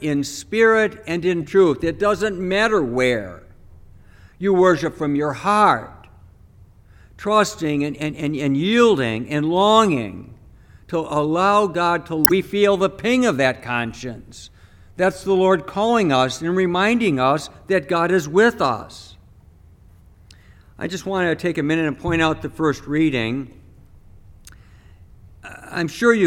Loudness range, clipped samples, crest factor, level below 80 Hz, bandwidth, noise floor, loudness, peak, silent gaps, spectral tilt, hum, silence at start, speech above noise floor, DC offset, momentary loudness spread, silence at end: 5 LU; under 0.1%; 20 dB; -48 dBFS; 19 kHz; -48 dBFS; -19 LUFS; 0 dBFS; none; -5 dB/octave; none; 0 s; 29 dB; under 0.1%; 12 LU; 0 s